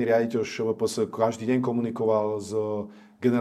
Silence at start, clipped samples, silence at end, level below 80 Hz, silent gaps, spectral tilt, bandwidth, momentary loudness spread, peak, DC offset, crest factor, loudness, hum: 0 s; under 0.1%; 0 s; -70 dBFS; none; -6 dB/octave; 14 kHz; 5 LU; -10 dBFS; under 0.1%; 16 dB; -26 LUFS; none